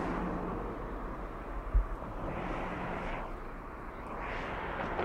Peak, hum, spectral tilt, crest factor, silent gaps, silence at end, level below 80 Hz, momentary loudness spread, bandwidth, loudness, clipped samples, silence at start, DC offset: -18 dBFS; none; -7.5 dB/octave; 20 dB; none; 0 s; -40 dBFS; 8 LU; 7.8 kHz; -39 LUFS; under 0.1%; 0 s; under 0.1%